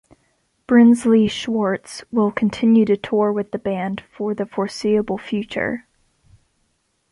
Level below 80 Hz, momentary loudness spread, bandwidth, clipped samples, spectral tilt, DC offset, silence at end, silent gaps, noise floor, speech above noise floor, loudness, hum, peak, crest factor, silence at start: -56 dBFS; 12 LU; 11.5 kHz; under 0.1%; -6 dB/octave; under 0.1%; 1.3 s; none; -67 dBFS; 49 dB; -19 LUFS; none; -2 dBFS; 16 dB; 0.7 s